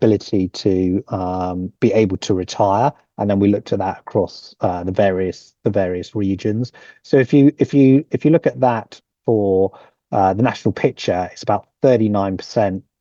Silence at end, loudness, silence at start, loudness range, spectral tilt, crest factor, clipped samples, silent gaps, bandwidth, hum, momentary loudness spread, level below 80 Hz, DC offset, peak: 0.2 s; -18 LUFS; 0 s; 4 LU; -7.5 dB/octave; 14 dB; under 0.1%; none; 7.6 kHz; none; 9 LU; -60 dBFS; under 0.1%; -2 dBFS